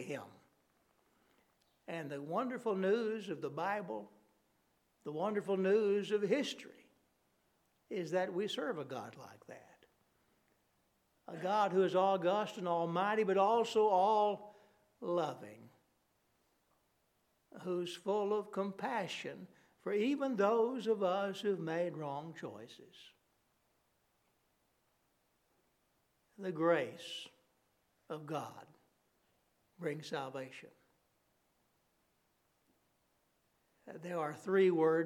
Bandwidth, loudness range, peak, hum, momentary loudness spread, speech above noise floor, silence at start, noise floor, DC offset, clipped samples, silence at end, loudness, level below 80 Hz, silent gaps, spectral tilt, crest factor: 14 kHz; 14 LU; -18 dBFS; none; 19 LU; 42 dB; 0 s; -78 dBFS; under 0.1%; under 0.1%; 0 s; -36 LUFS; -90 dBFS; none; -6 dB/octave; 20 dB